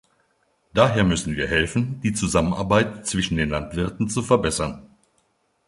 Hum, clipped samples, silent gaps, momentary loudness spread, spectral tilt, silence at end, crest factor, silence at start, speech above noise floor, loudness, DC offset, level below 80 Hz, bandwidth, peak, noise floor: none; under 0.1%; none; 7 LU; -5 dB/octave; 0.8 s; 22 dB; 0.75 s; 46 dB; -22 LUFS; under 0.1%; -40 dBFS; 11.5 kHz; -2 dBFS; -67 dBFS